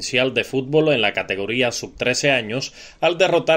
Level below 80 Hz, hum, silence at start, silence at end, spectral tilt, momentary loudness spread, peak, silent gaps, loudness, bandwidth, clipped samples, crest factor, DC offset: -54 dBFS; none; 0 s; 0 s; -3.5 dB/octave; 6 LU; -2 dBFS; none; -19 LUFS; 16 kHz; under 0.1%; 18 dB; under 0.1%